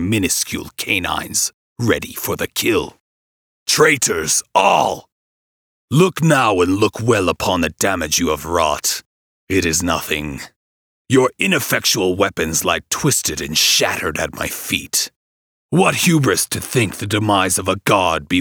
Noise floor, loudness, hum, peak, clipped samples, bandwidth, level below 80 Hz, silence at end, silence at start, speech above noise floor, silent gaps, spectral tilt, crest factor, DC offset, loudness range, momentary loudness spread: under -90 dBFS; -17 LUFS; none; 0 dBFS; under 0.1%; over 20 kHz; -44 dBFS; 0 s; 0 s; over 73 dB; 1.54-1.76 s, 3.00-3.66 s, 5.12-5.88 s, 9.06-9.47 s, 10.56-11.05 s, 15.16-15.69 s; -3.5 dB/octave; 18 dB; under 0.1%; 3 LU; 8 LU